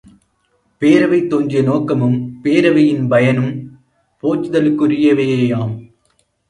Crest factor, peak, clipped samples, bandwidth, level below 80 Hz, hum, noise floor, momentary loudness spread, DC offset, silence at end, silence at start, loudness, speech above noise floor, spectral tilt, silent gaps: 14 dB; 0 dBFS; under 0.1%; 10.5 kHz; -56 dBFS; none; -62 dBFS; 9 LU; under 0.1%; 0.65 s; 0.8 s; -15 LUFS; 48 dB; -8 dB/octave; none